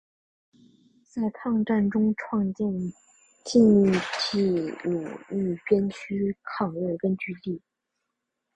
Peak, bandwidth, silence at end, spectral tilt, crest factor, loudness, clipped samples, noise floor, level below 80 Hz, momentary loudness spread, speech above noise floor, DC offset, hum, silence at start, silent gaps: -8 dBFS; 9 kHz; 1 s; -6.5 dB/octave; 18 dB; -26 LUFS; under 0.1%; -82 dBFS; -60 dBFS; 13 LU; 57 dB; under 0.1%; none; 1.15 s; none